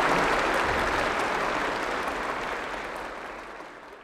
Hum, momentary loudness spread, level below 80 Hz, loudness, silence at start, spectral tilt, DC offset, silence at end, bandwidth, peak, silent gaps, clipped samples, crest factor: none; 15 LU; -46 dBFS; -27 LUFS; 0 s; -3.5 dB/octave; under 0.1%; 0 s; 17.5 kHz; -10 dBFS; none; under 0.1%; 18 dB